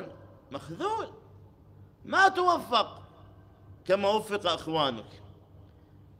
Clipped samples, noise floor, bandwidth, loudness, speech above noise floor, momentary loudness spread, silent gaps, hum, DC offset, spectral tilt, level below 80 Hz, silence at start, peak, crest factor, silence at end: under 0.1%; -55 dBFS; 16 kHz; -27 LUFS; 27 dB; 21 LU; none; none; under 0.1%; -4 dB/octave; -62 dBFS; 0 s; -10 dBFS; 22 dB; 0.6 s